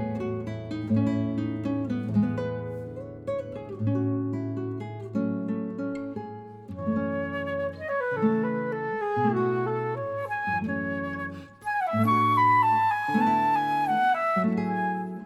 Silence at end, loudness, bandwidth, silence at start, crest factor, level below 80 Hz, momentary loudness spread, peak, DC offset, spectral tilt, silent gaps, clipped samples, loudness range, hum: 0 s; -27 LUFS; 13 kHz; 0 s; 16 dB; -62 dBFS; 12 LU; -12 dBFS; under 0.1%; -8 dB/octave; none; under 0.1%; 8 LU; none